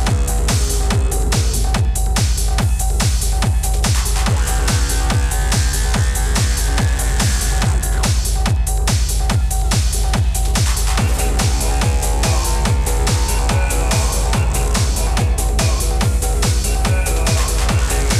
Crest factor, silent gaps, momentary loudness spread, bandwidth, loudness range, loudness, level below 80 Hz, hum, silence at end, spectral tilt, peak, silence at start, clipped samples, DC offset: 12 dB; none; 1 LU; 15.5 kHz; 0 LU; -17 LUFS; -18 dBFS; none; 0 s; -4 dB/octave; -2 dBFS; 0 s; under 0.1%; under 0.1%